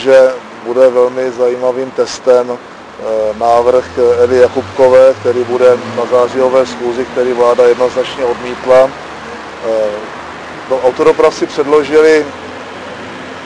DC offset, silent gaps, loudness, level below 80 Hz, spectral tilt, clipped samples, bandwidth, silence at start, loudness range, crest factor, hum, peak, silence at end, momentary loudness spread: under 0.1%; none; -11 LUFS; -48 dBFS; -5 dB/octave; 0.3%; 10.5 kHz; 0 s; 3 LU; 10 dB; none; 0 dBFS; 0 s; 17 LU